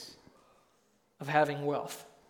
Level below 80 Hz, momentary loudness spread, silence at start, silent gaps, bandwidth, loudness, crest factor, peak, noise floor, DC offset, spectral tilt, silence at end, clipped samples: -78 dBFS; 16 LU; 0 s; none; 19 kHz; -32 LUFS; 24 dB; -10 dBFS; -71 dBFS; under 0.1%; -5 dB/octave; 0.25 s; under 0.1%